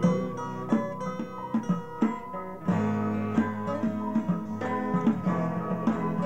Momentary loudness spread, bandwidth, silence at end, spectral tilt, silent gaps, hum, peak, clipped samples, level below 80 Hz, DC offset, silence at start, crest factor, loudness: 7 LU; 8.6 kHz; 0 s; -8.5 dB/octave; none; none; -12 dBFS; under 0.1%; -62 dBFS; 0.4%; 0 s; 16 dB; -29 LUFS